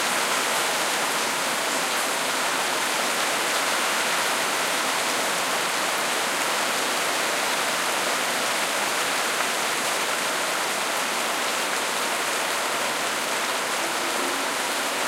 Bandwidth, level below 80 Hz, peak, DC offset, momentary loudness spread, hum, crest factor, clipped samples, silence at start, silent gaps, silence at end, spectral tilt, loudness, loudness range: 16 kHz; -72 dBFS; -10 dBFS; under 0.1%; 2 LU; none; 16 dB; under 0.1%; 0 s; none; 0 s; 0 dB/octave; -23 LUFS; 1 LU